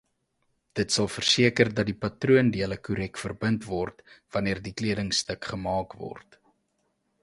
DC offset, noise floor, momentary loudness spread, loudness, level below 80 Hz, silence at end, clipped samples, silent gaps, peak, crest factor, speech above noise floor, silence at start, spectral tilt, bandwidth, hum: under 0.1%; -74 dBFS; 13 LU; -26 LUFS; -52 dBFS; 1.05 s; under 0.1%; none; -4 dBFS; 24 dB; 47 dB; 0.75 s; -4.5 dB/octave; 11.5 kHz; none